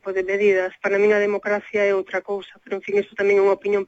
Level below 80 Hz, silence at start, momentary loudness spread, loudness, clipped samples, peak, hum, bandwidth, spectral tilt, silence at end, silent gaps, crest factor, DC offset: -64 dBFS; 0.05 s; 11 LU; -21 LUFS; under 0.1%; -8 dBFS; none; 7.8 kHz; -5.5 dB/octave; 0.05 s; none; 14 dB; under 0.1%